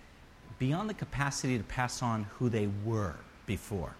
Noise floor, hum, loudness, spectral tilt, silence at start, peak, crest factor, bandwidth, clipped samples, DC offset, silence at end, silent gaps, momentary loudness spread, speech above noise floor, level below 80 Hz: -54 dBFS; none; -34 LUFS; -5.5 dB/octave; 0 s; -16 dBFS; 18 dB; 15 kHz; under 0.1%; under 0.1%; 0 s; none; 7 LU; 21 dB; -52 dBFS